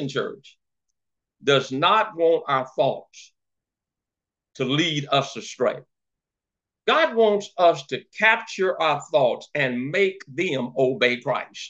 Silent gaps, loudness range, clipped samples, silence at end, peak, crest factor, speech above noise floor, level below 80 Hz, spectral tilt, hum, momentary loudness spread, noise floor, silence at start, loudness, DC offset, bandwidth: none; 6 LU; under 0.1%; 0 s; -4 dBFS; 20 dB; 66 dB; -76 dBFS; -4.5 dB/octave; none; 10 LU; -88 dBFS; 0 s; -22 LUFS; under 0.1%; 8.2 kHz